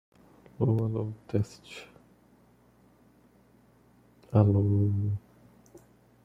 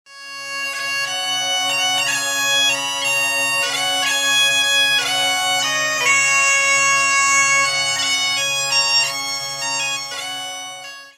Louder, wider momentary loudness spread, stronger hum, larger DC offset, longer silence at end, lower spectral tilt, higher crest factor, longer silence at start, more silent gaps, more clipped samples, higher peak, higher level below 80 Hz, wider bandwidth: second, -28 LUFS vs -16 LUFS; first, 17 LU vs 11 LU; neither; neither; first, 1.05 s vs 0.05 s; first, -9.5 dB/octave vs 1.5 dB/octave; first, 24 dB vs 16 dB; first, 0.6 s vs 0.1 s; neither; neither; second, -8 dBFS vs -4 dBFS; first, -62 dBFS vs -68 dBFS; second, 7.6 kHz vs 17 kHz